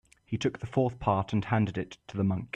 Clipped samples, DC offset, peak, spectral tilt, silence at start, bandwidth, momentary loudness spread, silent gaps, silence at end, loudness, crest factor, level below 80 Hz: under 0.1%; under 0.1%; -12 dBFS; -7.5 dB/octave; 0.3 s; 9 kHz; 9 LU; none; 0.1 s; -30 LUFS; 18 dB; -54 dBFS